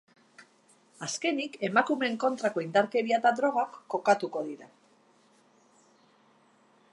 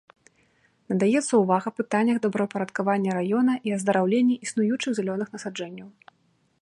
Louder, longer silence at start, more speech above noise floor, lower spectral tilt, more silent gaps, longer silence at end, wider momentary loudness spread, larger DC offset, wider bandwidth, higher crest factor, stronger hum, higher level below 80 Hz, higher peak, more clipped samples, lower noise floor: second, -28 LUFS vs -24 LUFS; second, 0.4 s vs 0.9 s; second, 35 dB vs 43 dB; second, -4 dB/octave vs -5.5 dB/octave; neither; first, 2.25 s vs 0.7 s; about the same, 11 LU vs 11 LU; neither; about the same, 11.5 kHz vs 11.5 kHz; first, 24 dB vs 18 dB; neither; second, -86 dBFS vs -74 dBFS; about the same, -8 dBFS vs -8 dBFS; neither; second, -63 dBFS vs -67 dBFS